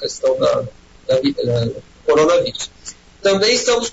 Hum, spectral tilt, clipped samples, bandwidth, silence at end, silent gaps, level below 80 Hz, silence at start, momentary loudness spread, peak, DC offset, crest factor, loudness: none; -4 dB/octave; under 0.1%; 8 kHz; 0 s; none; -48 dBFS; 0 s; 17 LU; -4 dBFS; under 0.1%; 12 dB; -17 LUFS